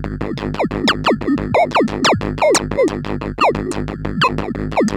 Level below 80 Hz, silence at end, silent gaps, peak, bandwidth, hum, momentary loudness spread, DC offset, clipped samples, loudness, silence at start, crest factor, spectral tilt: -34 dBFS; 0 s; none; -4 dBFS; 17 kHz; none; 9 LU; under 0.1%; under 0.1%; -17 LUFS; 0 s; 14 dB; -4.5 dB/octave